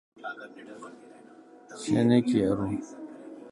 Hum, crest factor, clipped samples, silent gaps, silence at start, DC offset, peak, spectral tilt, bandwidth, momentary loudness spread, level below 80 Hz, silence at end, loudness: none; 20 dB; under 0.1%; none; 0.2 s; under 0.1%; -10 dBFS; -7 dB/octave; 11 kHz; 23 LU; -60 dBFS; 0 s; -26 LUFS